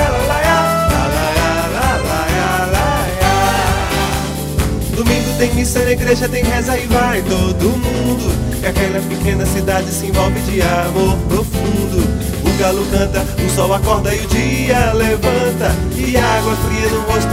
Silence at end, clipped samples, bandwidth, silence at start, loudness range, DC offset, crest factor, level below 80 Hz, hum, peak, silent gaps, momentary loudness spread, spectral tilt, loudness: 0 s; under 0.1%; 16.5 kHz; 0 s; 1 LU; under 0.1%; 14 dB; -22 dBFS; none; 0 dBFS; none; 4 LU; -5 dB/octave; -15 LUFS